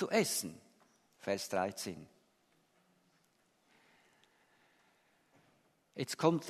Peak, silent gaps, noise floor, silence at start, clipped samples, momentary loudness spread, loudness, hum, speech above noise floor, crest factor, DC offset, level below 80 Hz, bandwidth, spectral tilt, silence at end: -16 dBFS; none; -74 dBFS; 0 s; under 0.1%; 19 LU; -37 LUFS; none; 39 dB; 24 dB; under 0.1%; -82 dBFS; 13.5 kHz; -4 dB/octave; 0 s